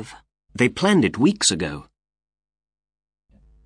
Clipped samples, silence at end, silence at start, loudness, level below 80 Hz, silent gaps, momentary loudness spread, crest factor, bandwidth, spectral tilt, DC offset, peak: under 0.1%; 1.85 s; 0 s; -19 LUFS; -52 dBFS; none; 21 LU; 20 dB; 10 kHz; -4 dB/octave; under 0.1%; -4 dBFS